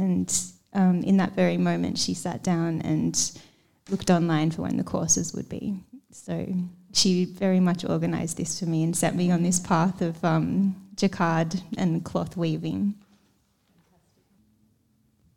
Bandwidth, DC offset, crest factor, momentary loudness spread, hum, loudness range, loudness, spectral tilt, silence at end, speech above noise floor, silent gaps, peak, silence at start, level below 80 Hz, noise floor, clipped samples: 15.5 kHz; under 0.1%; 20 dB; 9 LU; none; 4 LU; -25 LUFS; -5 dB/octave; 2.4 s; 42 dB; none; -6 dBFS; 0 s; -58 dBFS; -66 dBFS; under 0.1%